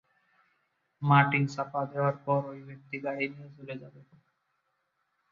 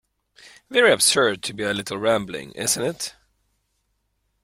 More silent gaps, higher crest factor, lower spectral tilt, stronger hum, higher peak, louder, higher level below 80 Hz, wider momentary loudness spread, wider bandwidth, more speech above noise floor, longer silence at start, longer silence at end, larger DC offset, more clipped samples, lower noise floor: neither; about the same, 24 dB vs 20 dB; first, -7.5 dB/octave vs -2 dB/octave; neither; second, -8 dBFS vs -4 dBFS; second, -29 LUFS vs -21 LUFS; second, -72 dBFS vs -60 dBFS; first, 20 LU vs 14 LU; second, 7.2 kHz vs 16 kHz; about the same, 48 dB vs 50 dB; first, 1 s vs 0.45 s; about the same, 1.45 s vs 1.35 s; neither; neither; first, -78 dBFS vs -72 dBFS